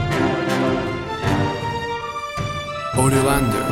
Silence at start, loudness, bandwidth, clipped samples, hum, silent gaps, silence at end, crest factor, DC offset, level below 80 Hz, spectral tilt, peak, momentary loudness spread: 0 s; -21 LUFS; 16.5 kHz; under 0.1%; none; none; 0 s; 16 dB; under 0.1%; -38 dBFS; -5.5 dB/octave; -4 dBFS; 9 LU